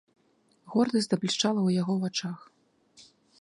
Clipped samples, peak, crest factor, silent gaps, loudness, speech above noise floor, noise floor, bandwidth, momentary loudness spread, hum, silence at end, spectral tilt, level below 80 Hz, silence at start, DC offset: under 0.1%; -12 dBFS; 18 dB; none; -28 LUFS; 40 dB; -67 dBFS; 11 kHz; 9 LU; none; 0.4 s; -5 dB/octave; -74 dBFS; 0.65 s; under 0.1%